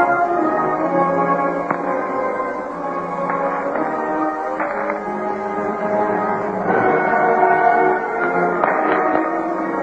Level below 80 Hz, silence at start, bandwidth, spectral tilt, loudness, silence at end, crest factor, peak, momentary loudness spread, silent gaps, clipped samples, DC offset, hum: -56 dBFS; 0 s; 8.2 kHz; -8 dB/octave; -19 LUFS; 0 s; 16 dB; -2 dBFS; 8 LU; none; under 0.1%; under 0.1%; none